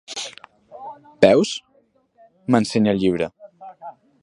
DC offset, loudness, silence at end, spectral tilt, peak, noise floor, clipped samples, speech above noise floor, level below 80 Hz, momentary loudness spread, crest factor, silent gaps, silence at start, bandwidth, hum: under 0.1%; -19 LUFS; 0.3 s; -5.5 dB/octave; 0 dBFS; -61 dBFS; under 0.1%; 44 dB; -56 dBFS; 24 LU; 22 dB; none; 0.1 s; 11.5 kHz; none